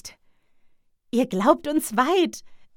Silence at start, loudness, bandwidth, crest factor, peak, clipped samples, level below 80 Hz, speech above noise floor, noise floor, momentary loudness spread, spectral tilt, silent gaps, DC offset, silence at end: 0.05 s; -22 LUFS; 18 kHz; 22 dB; -4 dBFS; under 0.1%; -60 dBFS; 37 dB; -59 dBFS; 13 LU; -4.5 dB/octave; none; under 0.1%; 0.15 s